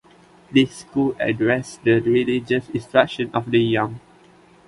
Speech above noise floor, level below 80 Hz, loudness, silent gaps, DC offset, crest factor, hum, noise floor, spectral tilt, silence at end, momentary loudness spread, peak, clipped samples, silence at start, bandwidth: 31 dB; -56 dBFS; -20 LUFS; none; under 0.1%; 20 dB; none; -51 dBFS; -6 dB/octave; 0.7 s; 5 LU; -2 dBFS; under 0.1%; 0.5 s; 11.5 kHz